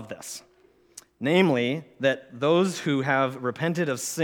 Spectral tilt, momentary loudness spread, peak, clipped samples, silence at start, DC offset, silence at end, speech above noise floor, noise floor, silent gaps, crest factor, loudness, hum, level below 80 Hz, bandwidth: -5 dB/octave; 14 LU; -6 dBFS; under 0.1%; 0 s; under 0.1%; 0 s; 32 dB; -56 dBFS; none; 20 dB; -25 LUFS; none; -74 dBFS; 19 kHz